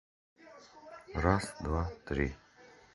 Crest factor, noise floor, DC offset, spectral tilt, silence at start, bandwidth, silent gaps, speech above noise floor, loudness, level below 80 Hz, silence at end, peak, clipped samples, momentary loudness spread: 26 dB; -59 dBFS; under 0.1%; -6.5 dB/octave; 0.45 s; 11.5 kHz; none; 26 dB; -34 LUFS; -44 dBFS; 0.3 s; -10 dBFS; under 0.1%; 23 LU